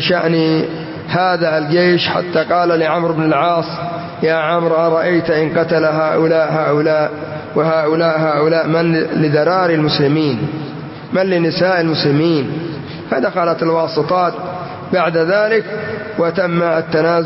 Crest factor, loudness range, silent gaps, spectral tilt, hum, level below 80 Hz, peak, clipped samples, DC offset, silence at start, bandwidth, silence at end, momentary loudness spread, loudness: 12 dB; 2 LU; none; -10 dB/octave; none; -54 dBFS; -2 dBFS; under 0.1%; under 0.1%; 0 s; 5.8 kHz; 0 s; 9 LU; -15 LUFS